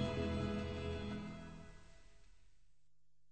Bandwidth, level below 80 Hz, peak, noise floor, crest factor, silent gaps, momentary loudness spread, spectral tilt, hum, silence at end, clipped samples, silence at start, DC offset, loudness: 8.8 kHz; -56 dBFS; -26 dBFS; -82 dBFS; 18 dB; none; 19 LU; -7 dB/octave; none; 0.85 s; under 0.1%; 0 s; 0.1%; -43 LUFS